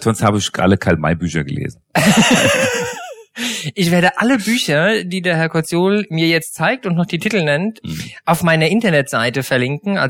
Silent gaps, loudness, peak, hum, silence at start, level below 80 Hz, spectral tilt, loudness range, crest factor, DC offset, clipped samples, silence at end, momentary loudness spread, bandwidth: none; -16 LUFS; 0 dBFS; none; 0 s; -46 dBFS; -4.5 dB/octave; 2 LU; 16 dB; under 0.1%; under 0.1%; 0 s; 10 LU; 17.5 kHz